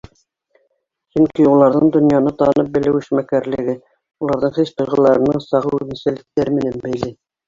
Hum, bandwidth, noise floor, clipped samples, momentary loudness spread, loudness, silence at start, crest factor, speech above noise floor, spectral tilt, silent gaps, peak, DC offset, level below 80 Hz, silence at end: none; 7.4 kHz; -68 dBFS; under 0.1%; 11 LU; -16 LUFS; 1.15 s; 16 dB; 52 dB; -8.5 dB/octave; none; -2 dBFS; under 0.1%; -50 dBFS; 0.35 s